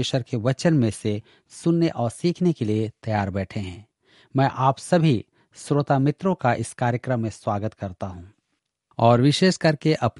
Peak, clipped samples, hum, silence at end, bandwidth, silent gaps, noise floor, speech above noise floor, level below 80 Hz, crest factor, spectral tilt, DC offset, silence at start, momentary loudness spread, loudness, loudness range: -2 dBFS; under 0.1%; none; 0 s; 11.5 kHz; none; -77 dBFS; 55 dB; -58 dBFS; 20 dB; -6.5 dB/octave; under 0.1%; 0 s; 13 LU; -23 LUFS; 3 LU